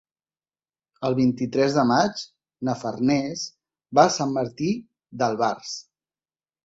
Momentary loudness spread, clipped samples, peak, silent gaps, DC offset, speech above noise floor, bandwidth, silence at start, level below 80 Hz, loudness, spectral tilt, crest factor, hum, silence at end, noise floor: 15 LU; under 0.1%; -4 dBFS; none; under 0.1%; over 68 dB; 8 kHz; 1 s; -64 dBFS; -23 LUFS; -5 dB/octave; 22 dB; none; 0.85 s; under -90 dBFS